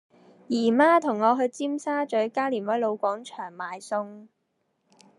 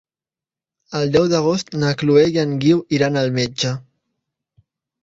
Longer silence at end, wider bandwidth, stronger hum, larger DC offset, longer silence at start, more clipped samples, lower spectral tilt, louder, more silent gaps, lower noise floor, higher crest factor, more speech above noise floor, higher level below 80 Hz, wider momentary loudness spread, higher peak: second, 0.95 s vs 1.25 s; first, 11.5 kHz vs 7.8 kHz; neither; neither; second, 0.5 s vs 0.9 s; neither; about the same, -5 dB/octave vs -6 dB/octave; second, -25 LUFS vs -18 LUFS; neither; second, -75 dBFS vs under -90 dBFS; about the same, 18 dB vs 16 dB; second, 50 dB vs over 73 dB; second, -90 dBFS vs -54 dBFS; first, 15 LU vs 9 LU; second, -8 dBFS vs -2 dBFS